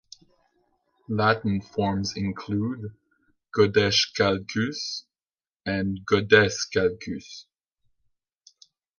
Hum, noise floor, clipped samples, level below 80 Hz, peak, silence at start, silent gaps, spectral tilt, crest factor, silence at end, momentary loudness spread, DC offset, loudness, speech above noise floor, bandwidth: none; under -90 dBFS; under 0.1%; -52 dBFS; -4 dBFS; 1.1 s; 5.49-5.60 s; -4.5 dB/octave; 24 dB; 1.55 s; 17 LU; under 0.1%; -24 LUFS; over 66 dB; 7.4 kHz